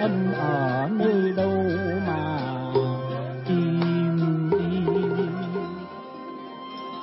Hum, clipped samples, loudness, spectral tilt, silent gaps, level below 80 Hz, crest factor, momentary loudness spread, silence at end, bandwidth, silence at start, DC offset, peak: none; under 0.1%; -25 LUFS; -12 dB/octave; none; -60 dBFS; 16 dB; 14 LU; 0 s; 5.8 kHz; 0 s; under 0.1%; -10 dBFS